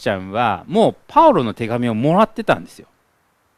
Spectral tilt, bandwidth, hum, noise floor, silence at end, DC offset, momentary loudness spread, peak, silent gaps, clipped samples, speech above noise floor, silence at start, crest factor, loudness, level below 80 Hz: -7 dB/octave; 13.5 kHz; none; -62 dBFS; 0.9 s; under 0.1%; 9 LU; 0 dBFS; none; under 0.1%; 45 dB; 0 s; 18 dB; -17 LUFS; -50 dBFS